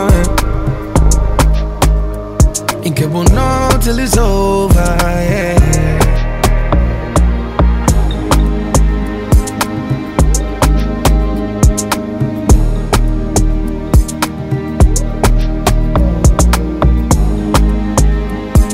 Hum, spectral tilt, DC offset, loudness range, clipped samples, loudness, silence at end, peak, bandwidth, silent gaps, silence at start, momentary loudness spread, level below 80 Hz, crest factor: none; -5.5 dB/octave; under 0.1%; 2 LU; under 0.1%; -13 LUFS; 0 s; 0 dBFS; 16.5 kHz; none; 0 s; 6 LU; -14 dBFS; 10 dB